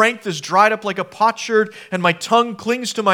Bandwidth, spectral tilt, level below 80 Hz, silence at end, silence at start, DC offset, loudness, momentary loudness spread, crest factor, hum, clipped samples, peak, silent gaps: 17.5 kHz; -4 dB/octave; -70 dBFS; 0 s; 0 s; under 0.1%; -18 LUFS; 8 LU; 18 dB; none; under 0.1%; 0 dBFS; none